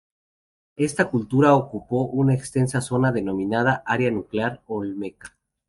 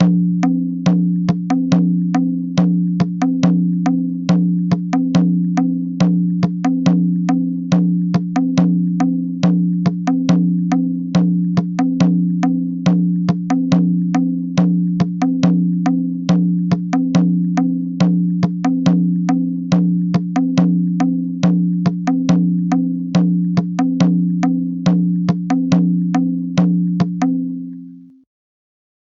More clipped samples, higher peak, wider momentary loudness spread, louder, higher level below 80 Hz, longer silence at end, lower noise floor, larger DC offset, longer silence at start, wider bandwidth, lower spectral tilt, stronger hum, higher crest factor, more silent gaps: neither; about the same, -2 dBFS vs -2 dBFS; first, 11 LU vs 3 LU; second, -22 LUFS vs -16 LUFS; about the same, -56 dBFS vs -54 dBFS; second, 0.4 s vs 1.1 s; first, under -90 dBFS vs -36 dBFS; neither; first, 0.8 s vs 0 s; first, 11.5 kHz vs 7.2 kHz; second, -6.5 dB/octave vs -8 dB/octave; neither; first, 20 dB vs 14 dB; neither